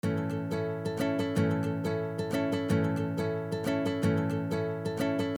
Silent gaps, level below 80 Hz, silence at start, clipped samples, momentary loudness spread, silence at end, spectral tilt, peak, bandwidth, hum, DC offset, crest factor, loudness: none; -64 dBFS; 0.05 s; under 0.1%; 4 LU; 0 s; -7 dB/octave; -16 dBFS; 18.5 kHz; none; under 0.1%; 14 dB; -31 LUFS